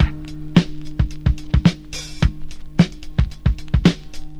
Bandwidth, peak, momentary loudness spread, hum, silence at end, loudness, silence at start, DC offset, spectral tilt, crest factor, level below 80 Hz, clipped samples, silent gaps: 10.5 kHz; 0 dBFS; 13 LU; none; 0 s; -20 LUFS; 0 s; under 0.1%; -6.5 dB/octave; 18 dB; -24 dBFS; under 0.1%; none